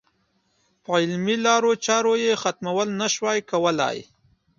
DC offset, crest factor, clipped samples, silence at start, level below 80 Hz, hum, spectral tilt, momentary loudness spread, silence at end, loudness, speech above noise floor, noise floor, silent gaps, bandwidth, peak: under 0.1%; 18 dB; under 0.1%; 0.9 s; -68 dBFS; none; -3.5 dB/octave; 6 LU; 0.55 s; -22 LUFS; 46 dB; -68 dBFS; none; 7.6 kHz; -6 dBFS